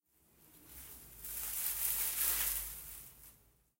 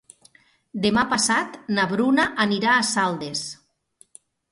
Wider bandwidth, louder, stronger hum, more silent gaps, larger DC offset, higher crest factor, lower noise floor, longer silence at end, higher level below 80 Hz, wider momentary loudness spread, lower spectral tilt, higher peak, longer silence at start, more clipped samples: first, 16 kHz vs 11.5 kHz; second, -35 LUFS vs -21 LUFS; neither; neither; neither; first, 26 dB vs 18 dB; first, -68 dBFS vs -59 dBFS; second, 0.45 s vs 0.95 s; about the same, -60 dBFS vs -58 dBFS; first, 21 LU vs 10 LU; second, 0.5 dB/octave vs -3 dB/octave; second, -16 dBFS vs -6 dBFS; second, 0.45 s vs 0.75 s; neither